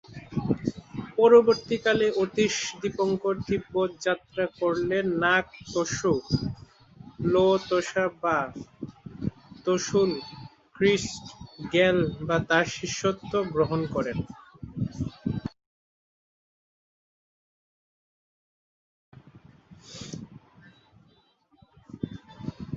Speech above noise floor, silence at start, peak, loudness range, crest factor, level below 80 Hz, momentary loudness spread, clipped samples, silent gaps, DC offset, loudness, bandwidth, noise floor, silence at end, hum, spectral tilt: 39 dB; 0.1 s; -6 dBFS; 21 LU; 22 dB; -54 dBFS; 18 LU; under 0.1%; 15.66-19.12 s; under 0.1%; -26 LUFS; 7.8 kHz; -64 dBFS; 0 s; none; -5 dB/octave